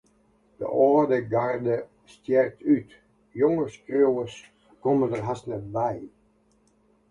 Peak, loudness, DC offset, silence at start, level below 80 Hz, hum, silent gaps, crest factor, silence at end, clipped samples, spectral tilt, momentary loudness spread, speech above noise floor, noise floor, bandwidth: -8 dBFS; -25 LUFS; under 0.1%; 0.6 s; -62 dBFS; none; none; 18 dB; 1 s; under 0.1%; -8 dB/octave; 15 LU; 40 dB; -64 dBFS; 10 kHz